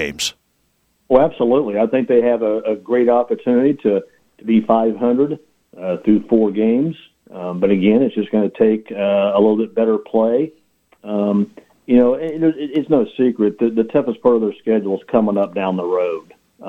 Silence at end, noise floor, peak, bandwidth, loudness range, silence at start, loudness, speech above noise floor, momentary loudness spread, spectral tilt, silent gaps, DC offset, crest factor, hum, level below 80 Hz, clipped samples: 0 s; -64 dBFS; 0 dBFS; 14 kHz; 2 LU; 0 s; -17 LUFS; 48 dB; 8 LU; -6.5 dB/octave; none; under 0.1%; 16 dB; none; -54 dBFS; under 0.1%